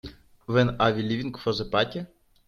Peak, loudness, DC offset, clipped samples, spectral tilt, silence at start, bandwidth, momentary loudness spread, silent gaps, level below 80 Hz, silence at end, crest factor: -6 dBFS; -26 LUFS; under 0.1%; under 0.1%; -7 dB/octave; 0.05 s; 7 kHz; 21 LU; none; -52 dBFS; 0.4 s; 20 dB